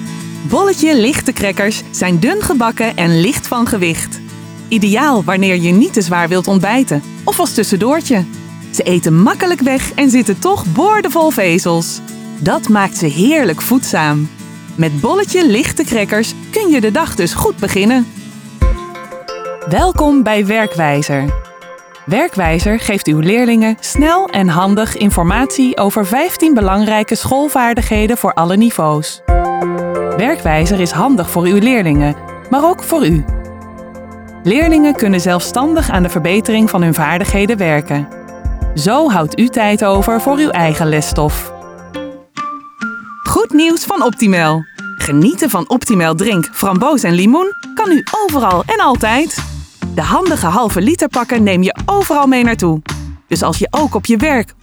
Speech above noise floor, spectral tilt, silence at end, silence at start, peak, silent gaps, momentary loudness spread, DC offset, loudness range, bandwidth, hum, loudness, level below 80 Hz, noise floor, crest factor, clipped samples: 23 dB; -5 dB/octave; 0.1 s; 0 s; -2 dBFS; none; 12 LU; under 0.1%; 2 LU; over 20 kHz; none; -13 LUFS; -28 dBFS; -34 dBFS; 12 dB; under 0.1%